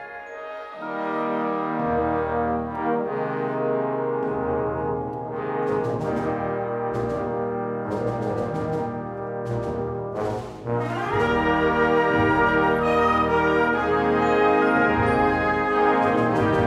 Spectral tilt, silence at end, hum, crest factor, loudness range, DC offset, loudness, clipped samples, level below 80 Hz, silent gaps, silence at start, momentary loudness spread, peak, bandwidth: -7.5 dB/octave; 0 s; none; 16 dB; 7 LU; under 0.1%; -23 LUFS; under 0.1%; -46 dBFS; none; 0 s; 10 LU; -6 dBFS; 11.5 kHz